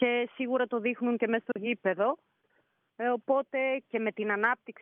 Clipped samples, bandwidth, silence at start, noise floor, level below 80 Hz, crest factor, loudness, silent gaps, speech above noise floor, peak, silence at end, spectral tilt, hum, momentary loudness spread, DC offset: under 0.1%; 3.7 kHz; 0 s; -73 dBFS; -84 dBFS; 18 dB; -30 LUFS; none; 43 dB; -12 dBFS; 0.1 s; -3 dB/octave; none; 4 LU; under 0.1%